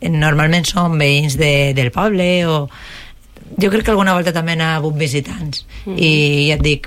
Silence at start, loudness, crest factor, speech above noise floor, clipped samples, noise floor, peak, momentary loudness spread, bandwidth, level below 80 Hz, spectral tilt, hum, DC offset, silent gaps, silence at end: 0 s; -14 LUFS; 12 dB; 23 dB; under 0.1%; -37 dBFS; -4 dBFS; 12 LU; 15.5 kHz; -32 dBFS; -5.5 dB/octave; none; under 0.1%; none; 0 s